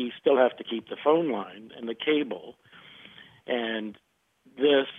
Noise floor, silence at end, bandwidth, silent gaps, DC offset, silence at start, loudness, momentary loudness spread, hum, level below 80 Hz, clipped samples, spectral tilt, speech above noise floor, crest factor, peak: -63 dBFS; 0 s; 3.9 kHz; none; under 0.1%; 0 s; -27 LUFS; 24 LU; none; -80 dBFS; under 0.1%; -7 dB/octave; 36 dB; 20 dB; -8 dBFS